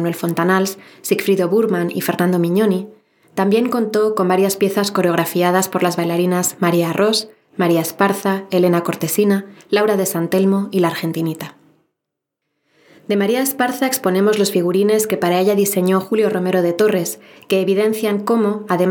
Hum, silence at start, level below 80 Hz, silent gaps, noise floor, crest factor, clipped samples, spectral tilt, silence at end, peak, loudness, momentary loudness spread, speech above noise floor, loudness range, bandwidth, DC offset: none; 0 s; -76 dBFS; none; -80 dBFS; 16 dB; under 0.1%; -5 dB/octave; 0 s; -2 dBFS; -17 LUFS; 5 LU; 63 dB; 4 LU; 19 kHz; under 0.1%